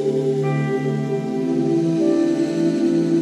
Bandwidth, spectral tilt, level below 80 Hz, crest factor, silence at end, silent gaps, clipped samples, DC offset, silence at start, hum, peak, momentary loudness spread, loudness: 11 kHz; -8 dB/octave; -66 dBFS; 12 dB; 0 s; none; under 0.1%; under 0.1%; 0 s; none; -8 dBFS; 4 LU; -20 LUFS